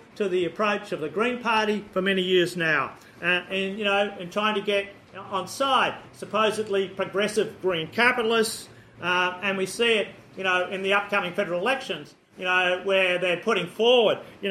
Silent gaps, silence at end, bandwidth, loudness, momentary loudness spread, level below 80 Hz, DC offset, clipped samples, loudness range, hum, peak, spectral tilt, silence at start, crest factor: none; 0 s; 15.5 kHz; -24 LUFS; 8 LU; -66 dBFS; under 0.1%; under 0.1%; 2 LU; none; -6 dBFS; -4 dB/octave; 0.15 s; 20 dB